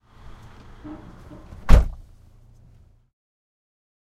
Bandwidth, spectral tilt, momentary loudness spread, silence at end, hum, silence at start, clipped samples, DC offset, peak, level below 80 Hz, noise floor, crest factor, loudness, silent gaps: 8.8 kHz; -7 dB/octave; 27 LU; 2.2 s; none; 1.65 s; under 0.1%; under 0.1%; 0 dBFS; -26 dBFS; -53 dBFS; 24 dB; -22 LUFS; none